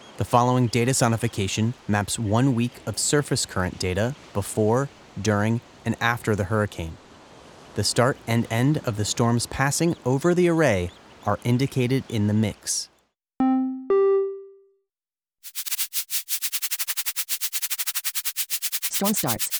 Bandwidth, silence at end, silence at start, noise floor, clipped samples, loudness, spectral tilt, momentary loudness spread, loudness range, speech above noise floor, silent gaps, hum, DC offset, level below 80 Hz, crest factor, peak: over 20 kHz; 0 s; 0 s; under -90 dBFS; under 0.1%; -23 LUFS; -4.5 dB/octave; 7 LU; 3 LU; over 67 dB; none; none; under 0.1%; -54 dBFS; 22 dB; -2 dBFS